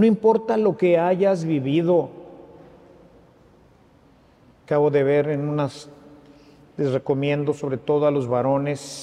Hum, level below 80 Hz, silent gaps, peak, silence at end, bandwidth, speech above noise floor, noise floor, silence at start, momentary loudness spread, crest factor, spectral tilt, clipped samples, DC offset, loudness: none; -62 dBFS; none; -6 dBFS; 0 s; 10.5 kHz; 34 dB; -54 dBFS; 0 s; 9 LU; 16 dB; -7.5 dB/octave; under 0.1%; under 0.1%; -21 LUFS